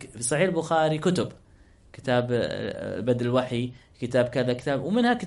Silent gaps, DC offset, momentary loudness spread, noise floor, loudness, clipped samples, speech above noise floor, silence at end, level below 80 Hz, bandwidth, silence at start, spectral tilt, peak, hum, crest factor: none; under 0.1%; 8 LU; -55 dBFS; -26 LUFS; under 0.1%; 29 dB; 0 s; -56 dBFS; 11.5 kHz; 0 s; -5.5 dB/octave; -10 dBFS; none; 16 dB